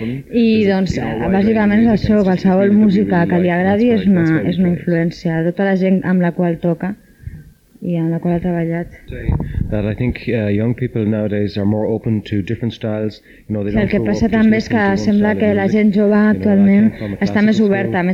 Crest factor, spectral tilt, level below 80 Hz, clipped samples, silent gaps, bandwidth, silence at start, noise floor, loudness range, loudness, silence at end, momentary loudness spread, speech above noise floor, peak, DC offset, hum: 10 dB; -8.5 dB/octave; -36 dBFS; under 0.1%; none; 7.2 kHz; 0 s; -39 dBFS; 6 LU; -15 LUFS; 0 s; 9 LU; 24 dB; -4 dBFS; under 0.1%; none